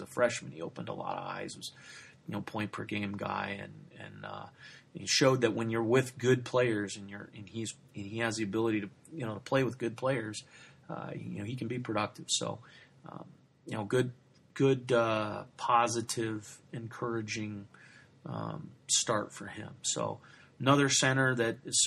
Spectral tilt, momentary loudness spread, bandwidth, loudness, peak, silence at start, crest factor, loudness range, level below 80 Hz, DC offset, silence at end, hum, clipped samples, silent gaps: -4 dB/octave; 19 LU; 13 kHz; -32 LUFS; -12 dBFS; 0 s; 22 dB; 8 LU; -72 dBFS; under 0.1%; 0 s; none; under 0.1%; none